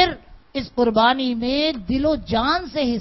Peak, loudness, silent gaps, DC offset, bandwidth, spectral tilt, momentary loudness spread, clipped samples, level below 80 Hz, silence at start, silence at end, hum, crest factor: -2 dBFS; -20 LUFS; none; under 0.1%; 6 kHz; -6.5 dB/octave; 12 LU; under 0.1%; -40 dBFS; 0 s; 0 s; none; 20 dB